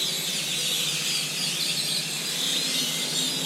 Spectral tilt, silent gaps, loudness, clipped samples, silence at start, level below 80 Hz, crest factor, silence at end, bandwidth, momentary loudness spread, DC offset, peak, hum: -0.5 dB/octave; none; -24 LUFS; under 0.1%; 0 s; -84 dBFS; 14 dB; 0 s; 16 kHz; 2 LU; under 0.1%; -14 dBFS; none